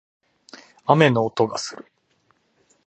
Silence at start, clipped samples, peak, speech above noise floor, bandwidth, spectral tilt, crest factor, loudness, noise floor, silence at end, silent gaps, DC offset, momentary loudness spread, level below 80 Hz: 0.85 s; under 0.1%; 0 dBFS; 46 dB; 8.8 kHz; -5.5 dB/octave; 22 dB; -20 LUFS; -65 dBFS; 1.05 s; none; under 0.1%; 16 LU; -66 dBFS